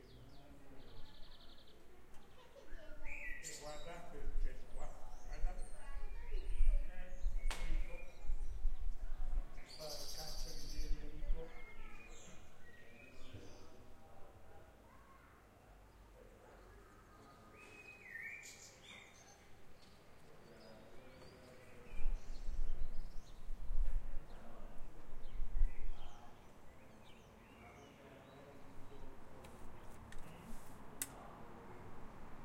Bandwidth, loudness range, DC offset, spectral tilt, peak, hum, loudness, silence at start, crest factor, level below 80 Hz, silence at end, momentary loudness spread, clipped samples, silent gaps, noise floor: 13.5 kHz; 13 LU; under 0.1%; -4 dB/octave; -20 dBFS; none; -52 LUFS; 0.05 s; 20 dB; -44 dBFS; 0 s; 16 LU; under 0.1%; none; -63 dBFS